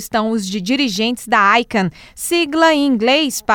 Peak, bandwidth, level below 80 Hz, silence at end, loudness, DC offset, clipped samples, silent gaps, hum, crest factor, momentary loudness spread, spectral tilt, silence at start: -2 dBFS; 19 kHz; -50 dBFS; 0 s; -15 LUFS; under 0.1%; under 0.1%; none; none; 14 dB; 7 LU; -3.5 dB/octave; 0 s